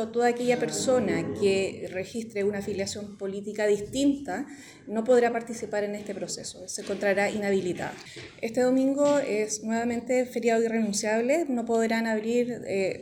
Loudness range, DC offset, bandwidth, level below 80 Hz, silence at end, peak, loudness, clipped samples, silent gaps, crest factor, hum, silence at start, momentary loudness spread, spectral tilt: 3 LU; under 0.1%; 18.5 kHz; -64 dBFS; 0 s; -12 dBFS; -27 LUFS; under 0.1%; none; 14 dB; none; 0 s; 11 LU; -4.5 dB/octave